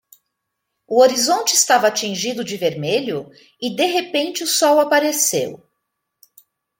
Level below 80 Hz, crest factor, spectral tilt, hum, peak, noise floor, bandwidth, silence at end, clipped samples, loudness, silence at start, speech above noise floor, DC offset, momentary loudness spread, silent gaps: -70 dBFS; 18 dB; -2 dB/octave; none; -2 dBFS; -77 dBFS; 17 kHz; 1.25 s; under 0.1%; -17 LUFS; 0.9 s; 59 dB; under 0.1%; 11 LU; none